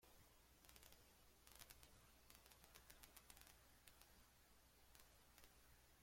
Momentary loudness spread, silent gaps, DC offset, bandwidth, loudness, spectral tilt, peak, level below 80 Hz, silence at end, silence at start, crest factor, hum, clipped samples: 5 LU; none; under 0.1%; 16.5 kHz; -67 LUFS; -2 dB/octave; -38 dBFS; -76 dBFS; 0 s; 0 s; 32 dB; none; under 0.1%